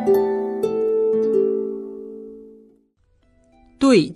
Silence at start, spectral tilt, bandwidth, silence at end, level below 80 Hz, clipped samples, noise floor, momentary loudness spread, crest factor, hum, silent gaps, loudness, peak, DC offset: 0 s; -6 dB/octave; 13.5 kHz; 0 s; -58 dBFS; under 0.1%; -61 dBFS; 19 LU; 18 dB; none; none; -20 LUFS; -4 dBFS; under 0.1%